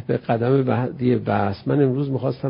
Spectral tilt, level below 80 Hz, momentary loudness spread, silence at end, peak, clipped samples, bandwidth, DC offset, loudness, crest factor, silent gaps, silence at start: -13 dB/octave; -50 dBFS; 4 LU; 0 s; -6 dBFS; under 0.1%; 5.4 kHz; under 0.1%; -21 LUFS; 16 dB; none; 0 s